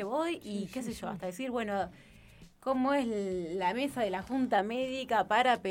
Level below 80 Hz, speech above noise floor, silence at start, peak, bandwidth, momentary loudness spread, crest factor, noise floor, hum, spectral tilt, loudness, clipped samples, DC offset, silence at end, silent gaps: -62 dBFS; 24 dB; 0 s; -12 dBFS; 17 kHz; 11 LU; 20 dB; -56 dBFS; none; -5 dB/octave; -32 LUFS; under 0.1%; under 0.1%; 0 s; none